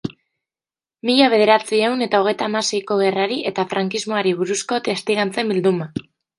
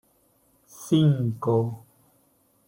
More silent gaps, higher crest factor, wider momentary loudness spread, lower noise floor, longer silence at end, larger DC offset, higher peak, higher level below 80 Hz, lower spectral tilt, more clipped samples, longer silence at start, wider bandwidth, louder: neither; about the same, 18 dB vs 16 dB; second, 7 LU vs 20 LU; first, under -90 dBFS vs -65 dBFS; second, 0.4 s vs 0.9 s; neither; first, -2 dBFS vs -10 dBFS; about the same, -64 dBFS vs -64 dBFS; second, -4 dB/octave vs -8 dB/octave; neither; second, 0.05 s vs 0.8 s; second, 11.5 kHz vs 16.5 kHz; first, -19 LUFS vs -24 LUFS